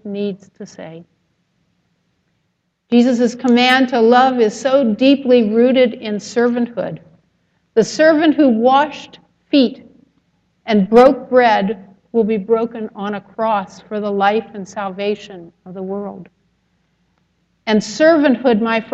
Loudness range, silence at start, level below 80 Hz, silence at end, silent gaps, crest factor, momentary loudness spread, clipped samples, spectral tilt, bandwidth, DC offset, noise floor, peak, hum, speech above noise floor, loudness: 9 LU; 0.05 s; -58 dBFS; 0.1 s; none; 16 dB; 18 LU; under 0.1%; -5.5 dB/octave; 8.4 kHz; under 0.1%; -68 dBFS; 0 dBFS; none; 53 dB; -15 LUFS